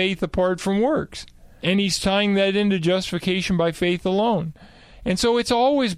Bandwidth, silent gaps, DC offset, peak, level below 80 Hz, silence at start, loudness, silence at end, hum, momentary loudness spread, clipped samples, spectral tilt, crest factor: 14 kHz; none; under 0.1%; -8 dBFS; -46 dBFS; 0 s; -21 LUFS; 0 s; none; 7 LU; under 0.1%; -5 dB/octave; 14 dB